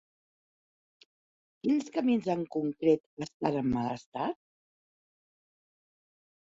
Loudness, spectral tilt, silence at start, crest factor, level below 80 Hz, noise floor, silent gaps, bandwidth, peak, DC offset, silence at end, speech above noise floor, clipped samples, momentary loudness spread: -31 LUFS; -7 dB/octave; 1.65 s; 22 dB; -66 dBFS; under -90 dBFS; 3.06-3.17 s, 3.34-3.40 s, 4.06-4.12 s; 7.8 kHz; -12 dBFS; under 0.1%; 2.15 s; over 60 dB; under 0.1%; 8 LU